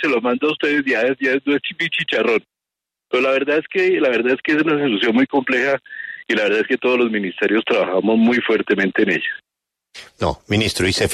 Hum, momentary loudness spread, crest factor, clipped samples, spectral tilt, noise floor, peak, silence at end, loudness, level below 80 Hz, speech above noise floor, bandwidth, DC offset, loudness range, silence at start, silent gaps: none; 5 LU; 14 dB; under 0.1%; -4.5 dB/octave; -85 dBFS; -4 dBFS; 0 s; -18 LUFS; -50 dBFS; 68 dB; 13.5 kHz; under 0.1%; 1 LU; 0 s; none